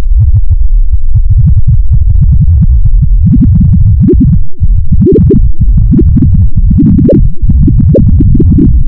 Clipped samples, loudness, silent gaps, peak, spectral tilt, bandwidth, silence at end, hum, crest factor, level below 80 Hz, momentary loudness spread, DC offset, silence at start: 5%; -7 LUFS; none; 0 dBFS; -15 dB/octave; 1.2 kHz; 0 s; none; 4 dB; -6 dBFS; 5 LU; under 0.1%; 0 s